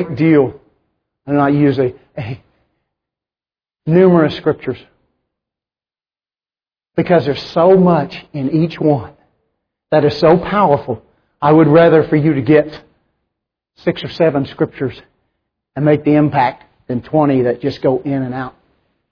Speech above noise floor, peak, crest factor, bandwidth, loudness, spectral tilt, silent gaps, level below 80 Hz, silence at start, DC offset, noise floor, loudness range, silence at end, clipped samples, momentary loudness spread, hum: over 77 dB; 0 dBFS; 16 dB; 5.4 kHz; -14 LUFS; -9.5 dB/octave; none; -50 dBFS; 0 s; under 0.1%; under -90 dBFS; 7 LU; 0.6 s; under 0.1%; 15 LU; none